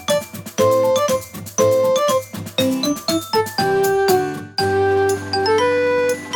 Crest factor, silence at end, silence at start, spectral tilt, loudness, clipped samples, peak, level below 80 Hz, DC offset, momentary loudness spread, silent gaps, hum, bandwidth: 14 dB; 0 s; 0 s; -4 dB/octave; -18 LUFS; under 0.1%; -4 dBFS; -56 dBFS; under 0.1%; 6 LU; none; none; over 20 kHz